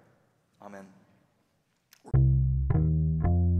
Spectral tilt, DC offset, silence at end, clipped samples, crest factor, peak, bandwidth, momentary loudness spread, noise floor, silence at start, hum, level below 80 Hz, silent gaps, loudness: -11.5 dB/octave; under 0.1%; 0 s; under 0.1%; 12 dB; -14 dBFS; 2.5 kHz; 23 LU; -73 dBFS; 0.65 s; none; -36 dBFS; none; -26 LUFS